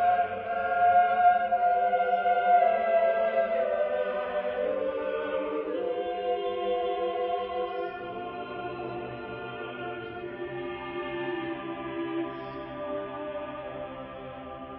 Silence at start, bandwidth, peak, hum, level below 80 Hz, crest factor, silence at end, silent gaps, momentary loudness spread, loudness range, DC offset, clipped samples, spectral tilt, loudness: 0 s; 4.5 kHz; -12 dBFS; none; -62 dBFS; 18 dB; 0 s; none; 15 LU; 12 LU; under 0.1%; under 0.1%; -3 dB/octave; -29 LUFS